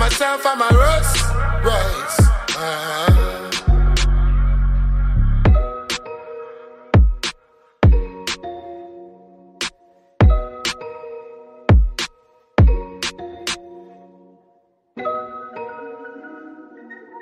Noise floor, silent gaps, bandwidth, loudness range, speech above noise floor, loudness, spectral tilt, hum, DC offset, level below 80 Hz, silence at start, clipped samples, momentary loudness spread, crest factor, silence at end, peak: -60 dBFS; none; 15 kHz; 12 LU; 45 dB; -19 LUFS; -5 dB/octave; none; under 0.1%; -20 dBFS; 0 s; under 0.1%; 20 LU; 16 dB; 0 s; -2 dBFS